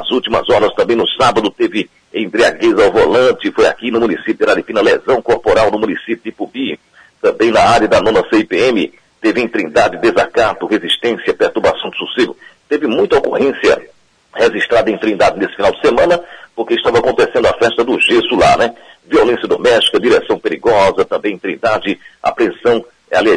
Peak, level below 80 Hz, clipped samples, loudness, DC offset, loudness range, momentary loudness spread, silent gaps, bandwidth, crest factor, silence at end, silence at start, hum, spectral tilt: 0 dBFS; -42 dBFS; under 0.1%; -13 LUFS; under 0.1%; 3 LU; 8 LU; none; 10.5 kHz; 12 dB; 0 s; 0 s; none; -4.5 dB/octave